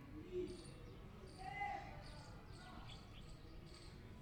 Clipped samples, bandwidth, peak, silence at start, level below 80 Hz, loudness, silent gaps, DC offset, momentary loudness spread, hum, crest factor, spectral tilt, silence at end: under 0.1%; 19.5 kHz; -34 dBFS; 0 s; -60 dBFS; -53 LUFS; none; under 0.1%; 11 LU; none; 18 dB; -5.5 dB/octave; 0 s